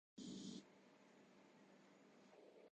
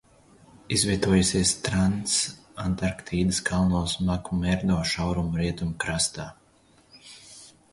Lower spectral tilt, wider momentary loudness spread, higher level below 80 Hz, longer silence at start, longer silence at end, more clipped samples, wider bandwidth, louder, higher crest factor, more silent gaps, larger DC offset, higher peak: about the same, -4.5 dB/octave vs -4 dB/octave; about the same, 15 LU vs 15 LU; second, under -90 dBFS vs -42 dBFS; second, 0.15 s vs 0.7 s; second, 0.05 s vs 0.25 s; neither; second, 9 kHz vs 11.5 kHz; second, -61 LUFS vs -25 LUFS; about the same, 18 dB vs 18 dB; neither; neither; second, -42 dBFS vs -8 dBFS